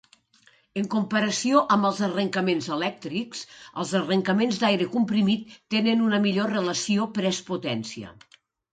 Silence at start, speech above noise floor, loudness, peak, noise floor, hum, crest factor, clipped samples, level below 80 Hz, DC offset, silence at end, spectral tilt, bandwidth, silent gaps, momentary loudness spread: 0.75 s; 36 dB; -25 LUFS; -6 dBFS; -61 dBFS; none; 18 dB; under 0.1%; -68 dBFS; under 0.1%; 0.6 s; -5 dB/octave; 9.4 kHz; none; 11 LU